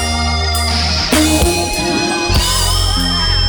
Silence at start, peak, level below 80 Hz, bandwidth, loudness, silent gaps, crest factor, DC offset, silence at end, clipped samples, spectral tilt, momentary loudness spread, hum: 0 s; 0 dBFS; -20 dBFS; over 20 kHz; -13 LUFS; none; 12 dB; under 0.1%; 0 s; under 0.1%; -3.5 dB/octave; 3 LU; none